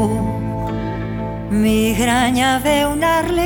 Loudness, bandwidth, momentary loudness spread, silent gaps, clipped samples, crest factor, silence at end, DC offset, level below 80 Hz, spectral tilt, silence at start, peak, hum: -17 LUFS; 19 kHz; 9 LU; none; under 0.1%; 14 dB; 0 s; under 0.1%; -32 dBFS; -5 dB/octave; 0 s; -4 dBFS; none